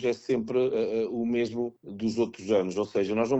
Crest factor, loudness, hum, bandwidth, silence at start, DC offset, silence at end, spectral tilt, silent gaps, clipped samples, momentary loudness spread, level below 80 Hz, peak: 16 dB; -28 LUFS; none; 8.2 kHz; 0 s; under 0.1%; 0 s; -6.5 dB/octave; none; under 0.1%; 5 LU; -64 dBFS; -12 dBFS